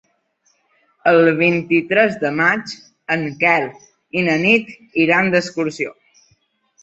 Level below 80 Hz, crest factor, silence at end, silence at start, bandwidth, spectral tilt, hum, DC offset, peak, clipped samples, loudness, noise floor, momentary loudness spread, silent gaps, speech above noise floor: -60 dBFS; 18 dB; 0.9 s; 1.05 s; 8 kHz; -6 dB/octave; none; under 0.1%; -2 dBFS; under 0.1%; -17 LUFS; -63 dBFS; 11 LU; none; 47 dB